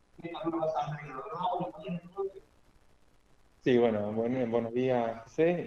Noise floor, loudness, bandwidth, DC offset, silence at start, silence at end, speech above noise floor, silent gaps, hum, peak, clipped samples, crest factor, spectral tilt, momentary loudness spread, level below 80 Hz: -62 dBFS; -32 LUFS; 7.2 kHz; under 0.1%; 0.2 s; 0 s; 32 dB; none; none; -14 dBFS; under 0.1%; 18 dB; -8 dB/octave; 13 LU; -66 dBFS